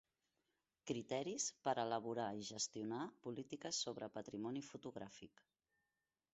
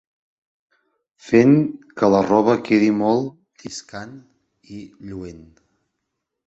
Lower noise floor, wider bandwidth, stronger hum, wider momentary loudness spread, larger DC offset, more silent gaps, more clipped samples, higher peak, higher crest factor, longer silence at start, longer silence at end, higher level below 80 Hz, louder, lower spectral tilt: first, under -90 dBFS vs -79 dBFS; about the same, 8 kHz vs 8.2 kHz; neither; second, 12 LU vs 23 LU; neither; neither; neither; second, -26 dBFS vs -2 dBFS; about the same, 22 dB vs 18 dB; second, 0.85 s vs 1.25 s; about the same, 1.05 s vs 1.1 s; second, -84 dBFS vs -56 dBFS; second, -45 LUFS vs -17 LUFS; second, -3.5 dB/octave vs -7 dB/octave